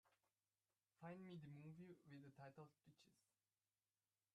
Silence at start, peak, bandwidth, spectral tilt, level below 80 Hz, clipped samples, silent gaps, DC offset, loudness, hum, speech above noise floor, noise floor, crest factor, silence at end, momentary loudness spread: 0.05 s; -48 dBFS; 9.6 kHz; -7.5 dB/octave; under -90 dBFS; under 0.1%; none; under 0.1%; -62 LUFS; none; over 27 dB; under -90 dBFS; 18 dB; 1.15 s; 6 LU